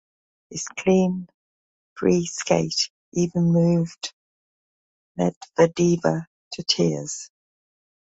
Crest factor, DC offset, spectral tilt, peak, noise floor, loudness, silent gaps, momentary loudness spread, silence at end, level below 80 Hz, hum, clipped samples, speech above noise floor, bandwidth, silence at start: 20 dB; under 0.1%; -5.5 dB/octave; -4 dBFS; under -90 dBFS; -23 LUFS; 1.34-1.96 s, 2.90-3.12 s, 4.13-5.15 s, 5.36-5.41 s, 6.27-6.51 s; 15 LU; 0.85 s; -60 dBFS; none; under 0.1%; over 68 dB; 8 kHz; 0.5 s